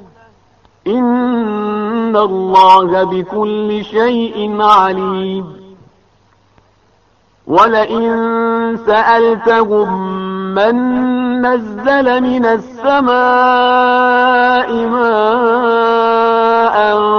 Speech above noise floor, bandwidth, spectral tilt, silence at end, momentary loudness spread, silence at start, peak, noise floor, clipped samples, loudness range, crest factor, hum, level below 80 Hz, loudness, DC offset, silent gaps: 42 dB; 7 kHz; -3 dB/octave; 0 s; 8 LU; 0.85 s; 0 dBFS; -53 dBFS; 0.1%; 5 LU; 12 dB; none; -50 dBFS; -12 LUFS; under 0.1%; none